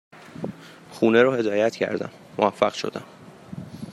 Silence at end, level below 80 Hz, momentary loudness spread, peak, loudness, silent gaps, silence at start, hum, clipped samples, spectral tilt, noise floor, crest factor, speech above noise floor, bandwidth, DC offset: 0 s; -68 dBFS; 22 LU; -4 dBFS; -22 LUFS; none; 0.15 s; none; under 0.1%; -5.5 dB/octave; -41 dBFS; 22 dB; 20 dB; 13 kHz; under 0.1%